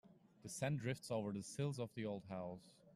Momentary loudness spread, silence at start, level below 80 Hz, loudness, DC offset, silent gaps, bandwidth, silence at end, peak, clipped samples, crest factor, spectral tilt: 10 LU; 0.05 s; -78 dBFS; -45 LUFS; under 0.1%; none; 13.5 kHz; 0.05 s; -30 dBFS; under 0.1%; 16 dB; -5.5 dB/octave